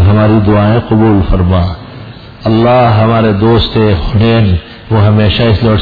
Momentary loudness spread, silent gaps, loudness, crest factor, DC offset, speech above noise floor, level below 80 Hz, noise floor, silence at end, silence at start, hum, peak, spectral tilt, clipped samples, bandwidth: 10 LU; none; -9 LUFS; 8 dB; under 0.1%; 20 dB; -22 dBFS; -28 dBFS; 0 s; 0 s; none; 0 dBFS; -10 dB/octave; under 0.1%; 5 kHz